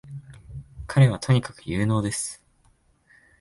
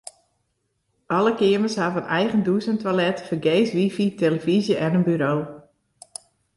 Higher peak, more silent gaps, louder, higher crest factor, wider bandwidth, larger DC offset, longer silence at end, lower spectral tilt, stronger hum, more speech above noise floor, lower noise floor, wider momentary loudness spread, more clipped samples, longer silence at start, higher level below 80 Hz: about the same, -6 dBFS vs -8 dBFS; neither; about the same, -23 LUFS vs -22 LUFS; about the same, 18 dB vs 14 dB; about the same, 11.5 kHz vs 11.5 kHz; neither; about the same, 1.05 s vs 0.95 s; about the same, -6 dB/octave vs -6.5 dB/octave; neither; second, 40 dB vs 52 dB; second, -62 dBFS vs -73 dBFS; first, 23 LU vs 16 LU; neither; second, 0.05 s vs 1.1 s; first, -48 dBFS vs -64 dBFS